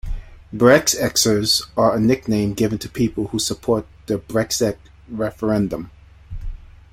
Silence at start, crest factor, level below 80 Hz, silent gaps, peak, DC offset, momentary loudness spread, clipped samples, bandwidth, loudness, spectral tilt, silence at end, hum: 0.05 s; 20 dB; -38 dBFS; none; 0 dBFS; under 0.1%; 21 LU; under 0.1%; 16.5 kHz; -19 LUFS; -4 dB/octave; 0.3 s; none